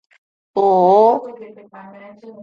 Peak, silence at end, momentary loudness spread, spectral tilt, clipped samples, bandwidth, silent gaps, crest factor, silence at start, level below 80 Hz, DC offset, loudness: -2 dBFS; 0 s; 14 LU; -8.5 dB/octave; under 0.1%; 7 kHz; none; 16 dB; 0.55 s; -70 dBFS; under 0.1%; -14 LUFS